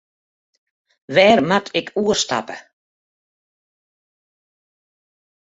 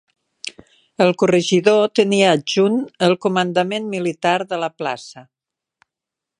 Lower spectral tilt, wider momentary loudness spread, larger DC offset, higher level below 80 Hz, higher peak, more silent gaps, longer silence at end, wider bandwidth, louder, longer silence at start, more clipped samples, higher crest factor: second, -3.5 dB/octave vs -5 dB/octave; about the same, 15 LU vs 17 LU; neither; first, -60 dBFS vs -68 dBFS; about the same, -2 dBFS vs 0 dBFS; neither; first, 3 s vs 1.15 s; second, 8 kHz vs 10.5 kHz; about the same, -17 LUFS vs -17 LUFS; first, 1.1 s vs 0.45 s; neither; about the same, 22 dB vs 18 dB